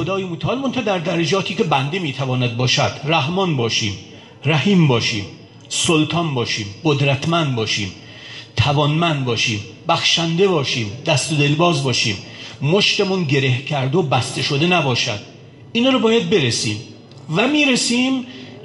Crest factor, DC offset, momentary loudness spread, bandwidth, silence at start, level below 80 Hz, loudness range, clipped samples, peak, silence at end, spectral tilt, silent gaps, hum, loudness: 14 dB; under 0.1%; 10 LU; 11.5 kHz; 0 s; -48 dBFS; 2 LU; under 0.1%; -4 dBFS; 0 s; -4.5 dB/octave; none; none; -18 LUFS